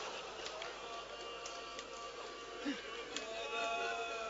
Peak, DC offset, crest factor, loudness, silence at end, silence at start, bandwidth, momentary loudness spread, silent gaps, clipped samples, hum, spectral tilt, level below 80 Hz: -24 dBFS; under 0.1%; 20 dB; -43 LUFS; 0 s; 0 s; 7.6 kHz; 8 LU; none; under 0.1%; none; 0 dB/octave; -70 dBFS